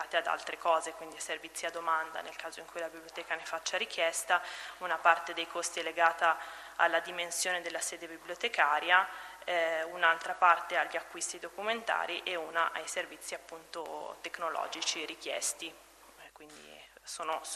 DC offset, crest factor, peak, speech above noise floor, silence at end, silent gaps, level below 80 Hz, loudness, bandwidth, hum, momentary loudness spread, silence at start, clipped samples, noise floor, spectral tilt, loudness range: under 0.1%; 24 dB; -10 dBFS; 22 dB; 0 s; none; -74 dBFS; -33 LUFS; 13.5 kHz; none; 15 LU; 0 s; under 0.1%; -56 dBFS; 0 dB/octave; 8 LU